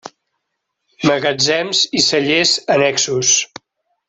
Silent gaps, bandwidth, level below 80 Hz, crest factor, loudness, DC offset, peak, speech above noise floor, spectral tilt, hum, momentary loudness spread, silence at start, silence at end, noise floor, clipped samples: none; 8.4 kHz; -58 dBFS; 16 dB; -14 LUFS; under 0.1%; -2 dBFS; 59 dB; -2 dB/octave; none; 3 LU; 1 s; 0.65 s; -75 dBFS; under 0.1%